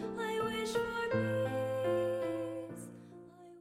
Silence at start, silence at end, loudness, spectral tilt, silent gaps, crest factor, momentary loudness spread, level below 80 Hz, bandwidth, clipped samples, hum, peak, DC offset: 0 s; 0 s; -35 LUFS; -5.5 dB/octave; none; 14 dB; 19 LU; -66 dBFS; 15.5 kHz; under 0.1%; none; -22 dBFS; under 0.1%